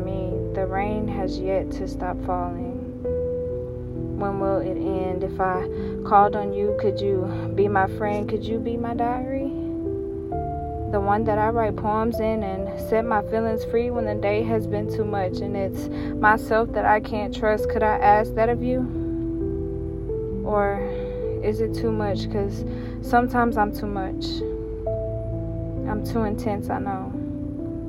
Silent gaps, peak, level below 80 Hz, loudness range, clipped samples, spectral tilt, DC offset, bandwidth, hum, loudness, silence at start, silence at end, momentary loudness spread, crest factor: none; -4 dBFS; -36 dBFS; 5 LU; under 0.1%; -8 dB/octave; under 0.1%; 15.5 kHz; none; -24 LUFS; 0 s; 0 s; 9 LU; 20 dB